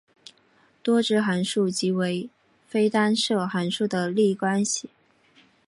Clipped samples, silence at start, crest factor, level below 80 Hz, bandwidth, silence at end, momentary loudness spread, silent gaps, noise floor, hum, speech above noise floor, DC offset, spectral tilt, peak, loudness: under 0.1%; 0.85 s; 16 dB; -72 dBFS; 11.5 kHz; 0.8 s; 8 LU; none; -61 dBFS; none; 38 dB; under 0.1%; -4.5 dB/octave; -10 dBFS; -24 LUFS